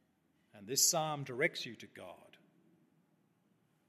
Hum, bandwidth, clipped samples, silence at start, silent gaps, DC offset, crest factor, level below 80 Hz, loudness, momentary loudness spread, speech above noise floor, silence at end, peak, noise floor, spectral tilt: none; 14 kHz; under 0.1%; 0.55 s; none; under 0.1%; 26 dB; -90 dBFS; -33 LUFS; 23 LU; 39 dB; 1.75 s; -14 dBFS; -75 dBFS; -1.5 dB/octave